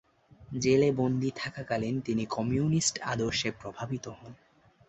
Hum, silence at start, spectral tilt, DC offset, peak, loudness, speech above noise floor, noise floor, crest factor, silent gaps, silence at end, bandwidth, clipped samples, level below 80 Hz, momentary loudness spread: none; 0.4 s; -5 dB/octave; under 0.1%; -12 dBFS; -30 LUFS; 21 dB; -51 dBFS; 18 dB; none; 0.55 s; 8.2 kHz; under 0.1%; -58 dBFS; 14 LU